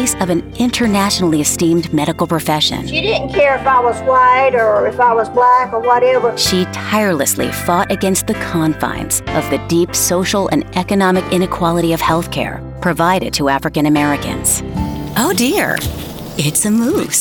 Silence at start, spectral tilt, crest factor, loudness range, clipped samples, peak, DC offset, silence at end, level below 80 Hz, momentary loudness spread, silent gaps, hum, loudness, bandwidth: 0 s; -4 dB/octave; 12 dB; 3 LU; under 0.1%; -2 dBFS; under 0.1%; 0 s; -36 dBFS; 6 LU; none; none; -14 LUFS; over 20 kHz